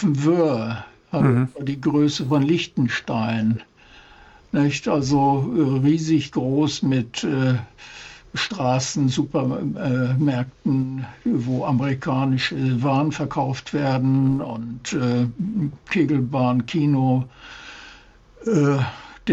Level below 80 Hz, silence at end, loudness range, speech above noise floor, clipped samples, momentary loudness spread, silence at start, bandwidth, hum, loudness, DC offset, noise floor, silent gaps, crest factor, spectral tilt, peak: -52 dBFS; 0 s; 2 LU; 28 dB; under 0.1%; 10 LU; 0 s; 8 kHz; none; -22 LUFS; under 0.1%; -48 dBFS; none; 14 dB; -6.5 dB/octave; -6 dBFS